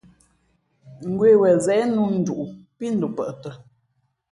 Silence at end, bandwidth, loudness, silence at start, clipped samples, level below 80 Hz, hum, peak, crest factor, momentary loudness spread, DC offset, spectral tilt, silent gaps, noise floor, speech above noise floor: 0.75 s; 11 kHz; -20 LUFS; 0.85 s; under 0.1%; -62 dBFS; none; -6 dBFS; 16 dB; 19 LU; under 0.1%; -7 dB/octave; none; -70 dBFS; 50 dB